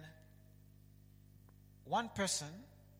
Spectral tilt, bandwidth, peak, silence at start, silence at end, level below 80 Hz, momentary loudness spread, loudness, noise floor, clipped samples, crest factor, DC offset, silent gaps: -3 dB/octave; 16.5 kHz; -24 dBFS; 0 s; 0 s; -68 dBFS; 23 LU; -39 LUFS; -62 dBFS; under 0.1%; 20 dB; under 0.1%; none